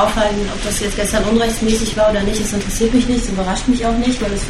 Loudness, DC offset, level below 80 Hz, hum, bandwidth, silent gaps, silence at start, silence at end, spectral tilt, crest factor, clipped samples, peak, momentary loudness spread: -17 LUFS; under 0.1%; -26 dBFS; none; 14.5 kHz; none; 0 s; 0 s; -4 dB/octave; 14 dB; under 0.1%; -2 dBFS; 4 LU